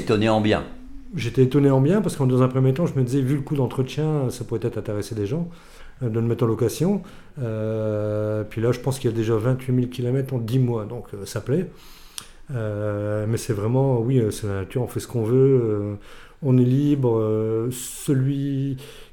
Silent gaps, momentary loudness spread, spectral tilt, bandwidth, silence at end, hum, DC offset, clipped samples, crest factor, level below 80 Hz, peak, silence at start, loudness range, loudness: none; 12 LU; -7.5 dB/octave; 17 kHz; 0.1 s; none; under 0.1%; under 0.1%; 16 dB; -46 dBFS; -6 dBFS; 0 s; 5 LU; -23 LUFS